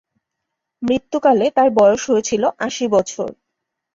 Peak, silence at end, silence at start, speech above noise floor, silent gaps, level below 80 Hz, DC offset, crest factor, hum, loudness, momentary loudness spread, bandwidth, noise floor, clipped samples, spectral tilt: -2 dBFS; 0.6 s; 0.8 s; 63 dB; none; -56 dBFS; under 0.1%; 16 dB; none; -17 LUFS; 13 LU; 7.8 kHz; -79 dBFS; under 0.1%; -4 dB/octave